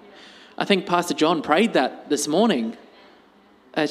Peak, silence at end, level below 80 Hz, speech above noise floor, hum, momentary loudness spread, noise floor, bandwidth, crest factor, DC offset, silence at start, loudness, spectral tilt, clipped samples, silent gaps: -2 dBFS; 0 s; -68 dBFS; 33 dB; none; 11 LU; -54 dBFS; 15.5 kHz; 20 dB; under 0.1%; 0.6 s; -21 LUFS; -4 dB/octave; under 0.1%; none